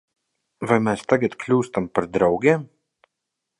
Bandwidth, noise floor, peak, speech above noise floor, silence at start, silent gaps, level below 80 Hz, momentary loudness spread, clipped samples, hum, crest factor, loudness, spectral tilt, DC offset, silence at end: 11.5 kHz; -82 dBFS; -2 dBFS; 61 dB; 0.6 s; none; -56 dBFS; 6 LU; under 0.1%; none; 20 dB; -21 LUFS; -7 dB/octave; under 0.1%; 0.95 s